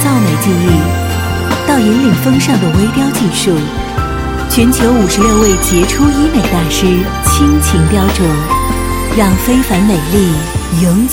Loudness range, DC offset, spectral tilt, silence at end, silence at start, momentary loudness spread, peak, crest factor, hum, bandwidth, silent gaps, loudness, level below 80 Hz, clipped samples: 2 LU; under 0.1%; -5 dB/octave; 0 s; 0 s; 6 LU; 0 dBFS; 10 dB; none; 17 kHz; none; -11 LUFS; -20 dBFS; under 0.1%